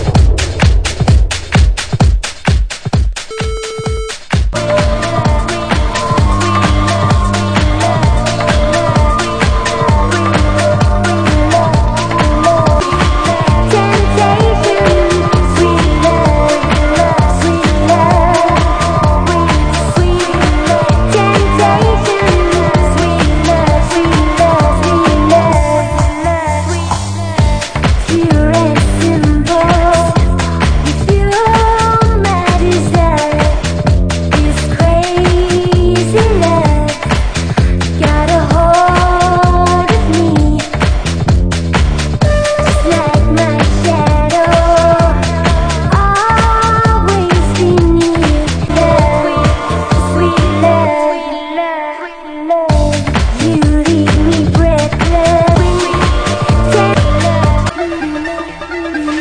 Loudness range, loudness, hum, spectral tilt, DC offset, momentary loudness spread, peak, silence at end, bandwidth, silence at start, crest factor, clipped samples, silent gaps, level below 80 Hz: 3 LU; -11 LUFS; none; -6 dB/octave; under 0.1%; 5 LU; 0 dBFS; 0 s; 10 kHz; 0 s; 10 dB; under 0.1%; none; -16 dBFS